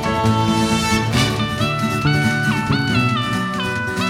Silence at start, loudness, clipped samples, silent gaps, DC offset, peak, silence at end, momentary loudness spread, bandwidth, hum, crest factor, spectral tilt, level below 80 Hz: 0 s; -18 LUFS; under 0.1%; none; under 0.1%; -2 dBFS; 0 s; 4 LU; 16.5 kHz; none; 16 dB; -5 dB/octave; -38 dBFS